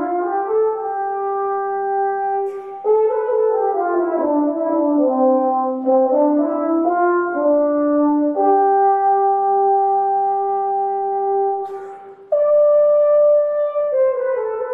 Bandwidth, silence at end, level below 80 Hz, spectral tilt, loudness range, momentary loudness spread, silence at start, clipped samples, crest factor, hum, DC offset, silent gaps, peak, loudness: 2.9 kHz; 0 s; -66 dBFS; -9 dB/octave; 3 LU; 8 LU; 0 s; under 0.1%; 12 dB; none; under 0.1%; none; -6 dBFS; -17 LUFS